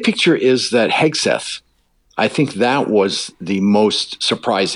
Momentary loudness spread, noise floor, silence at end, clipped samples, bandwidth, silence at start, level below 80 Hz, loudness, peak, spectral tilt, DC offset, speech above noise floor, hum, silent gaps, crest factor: 8 LU; -59 dBFS; 0 s; under 0.1%; 11 kHz; 0 s; -62 dBFS; -16 LUFS; -4 dBFS; -4 dB/octave; under 0.1%; 43 dB; none; none; 14 dB